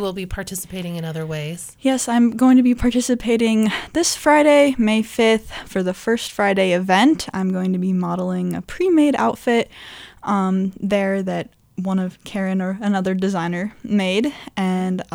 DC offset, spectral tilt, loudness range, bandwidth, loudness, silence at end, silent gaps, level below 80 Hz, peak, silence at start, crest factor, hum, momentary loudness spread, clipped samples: under 0.1%; -5 dB/octave; 6 LU; 17 kHz; -19 LUFS; 0.1 s; none; -44 dBFS; -2 dBFS; 0 s; 16 dB; none; 13 LU; under 0.1%